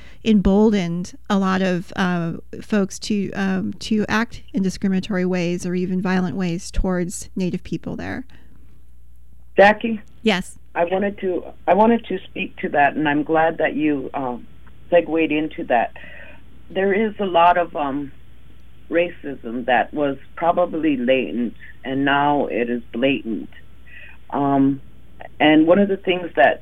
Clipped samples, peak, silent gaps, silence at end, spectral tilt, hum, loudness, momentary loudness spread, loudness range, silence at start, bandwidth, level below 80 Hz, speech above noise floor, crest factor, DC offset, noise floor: under 0.1%; -2 dBFS; none; 0 s; -6 dB/octave; none; -20 LUFS; 13 LU; 3 LU; 0 s; 12.5 kHz; -40 dBFS; 29 dB; 20 dB; 2%; -48 dBFS